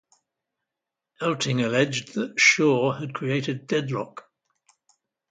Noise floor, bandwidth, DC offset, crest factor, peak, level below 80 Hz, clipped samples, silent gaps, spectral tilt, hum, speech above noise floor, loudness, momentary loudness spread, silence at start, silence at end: -87 dBFS; 9.6 kHz; under 0.1%; 22 dB; -4 dBFS; -70 dBFS; under 0.1%; none; -4 dB/octave; none; 63 dB; -23 LUFS; 12 LU; 1.2 s; 1.1 s